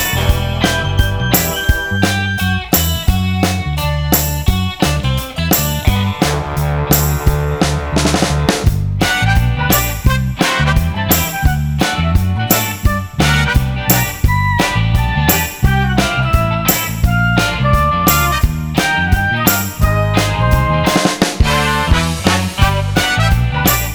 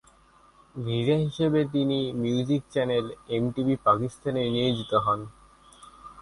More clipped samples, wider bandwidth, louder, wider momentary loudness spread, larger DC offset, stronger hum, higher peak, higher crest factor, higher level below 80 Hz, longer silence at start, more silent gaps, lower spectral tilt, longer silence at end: neither; first, over 20 kHz vs 11.5 kHz; first, -14 LUFS vs -26 LUFS; second, 3 LU vs 7 LU; neither; neither; first, 0 dBFS vs -8 dBFS; about the same, 14 dB vs 18 dB; first, -20 dBFS vs -56 dBFS; second, 0 s vs 0.75 s; neither; second, -4.5 dB/octave vs -7 dB/octave; about the same, 0 s vs 0 s